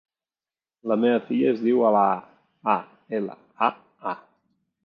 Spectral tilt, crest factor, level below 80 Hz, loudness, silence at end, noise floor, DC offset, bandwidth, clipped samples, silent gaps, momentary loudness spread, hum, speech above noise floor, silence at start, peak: -9 dB/octave; 20 dB; -78 dBFS; -24 LUFS; 0.7 s; under -90 dBFS; under 0.1%; 5.4 kHz; under 0.1%; none; 14 LU; none; over 68 dB; 0.85 s; -4 dBFS